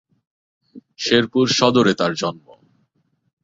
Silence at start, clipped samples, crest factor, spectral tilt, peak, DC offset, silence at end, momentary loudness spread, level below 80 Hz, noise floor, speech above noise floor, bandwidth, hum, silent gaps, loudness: 0.75 s; under 0.1%; 20 dB; -4.5 dB/octave; -2 dBFS; under 0.1%; 1.05 s; 11 LU; -60 dBFS; -67 dBFS; 50 dB; 7.8 kHz; none; none; -18 LUFS